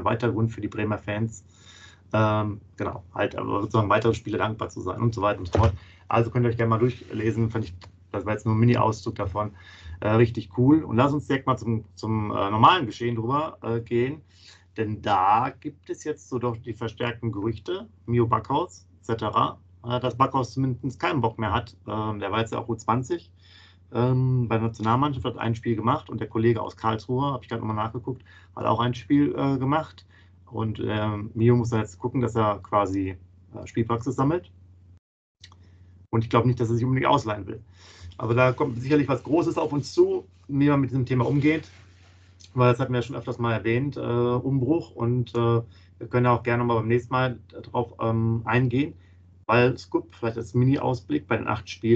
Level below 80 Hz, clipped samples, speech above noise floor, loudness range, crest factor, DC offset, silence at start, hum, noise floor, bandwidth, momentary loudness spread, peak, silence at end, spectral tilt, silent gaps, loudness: -52 dBFS; under 0.1%; 28 dB; 4 LU; 22 dB; under 0.1%; 0 s; none; -53 dBFS; 7.8 kHz; 11 LU; -4 dBFS; 0 s; -7.5 dB/octave; 34.99-35.35 s; -25 LUFS